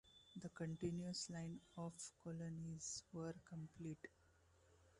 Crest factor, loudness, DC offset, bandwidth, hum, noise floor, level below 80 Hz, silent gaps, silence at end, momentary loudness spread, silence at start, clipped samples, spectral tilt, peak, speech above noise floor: 20 dB; -51 LUFS; under 0.1%; 11 kHz; none; -74 dBFS; -76 dBFS; none; 0 s; 9 LU; 0.05 s; under 0.1%; -5 dB/octave; -32 dBFS; 24 dB